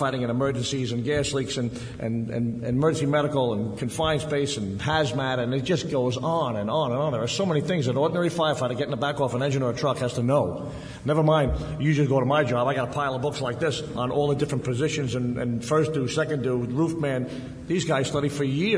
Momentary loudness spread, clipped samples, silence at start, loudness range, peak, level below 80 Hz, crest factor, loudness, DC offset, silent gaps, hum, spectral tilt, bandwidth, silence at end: 6 LU; under 0.1%; 0 s; 2 LU; -10 dBFS; -46 dBFS; 16 dB; -25 LUFS; under 0.1%; none; none; -6 dB/octave; 11 kHz; 0 s